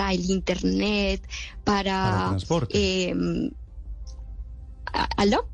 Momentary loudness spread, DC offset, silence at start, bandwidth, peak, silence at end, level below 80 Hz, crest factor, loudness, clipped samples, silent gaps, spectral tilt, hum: 18 LU; under 0.1%; 0 s; 9.4 kHz; -10 dBFS; 0 s; -38 dBFS; 16 dB; -25 LUFS; under 0.1%; none; -5.5 dB/octave; none